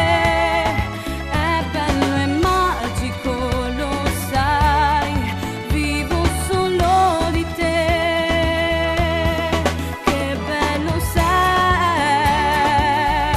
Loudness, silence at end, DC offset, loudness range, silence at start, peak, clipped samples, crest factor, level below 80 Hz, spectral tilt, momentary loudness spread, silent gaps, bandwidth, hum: -18 LUFS; 0 s; under 0.1%; 2 LU; 0 s; -4 dBFS; under 0.1%; 14 dB; -28 dBFS; -5 dB/octave; 7 LU; none; 14 kHz; none